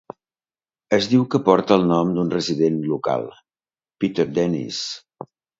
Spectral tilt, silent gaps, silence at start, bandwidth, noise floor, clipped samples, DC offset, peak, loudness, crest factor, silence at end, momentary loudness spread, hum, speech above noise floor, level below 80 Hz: -6 dB/octave; none; 0.9 s; 7.8 kHz; under -90 dBFS; under 0.1%; under 0.1%; 0 dBFS; -20 LUFS; 22 dB; 0.35 s; 10 LU; none; over 71 dB; -58 dBFS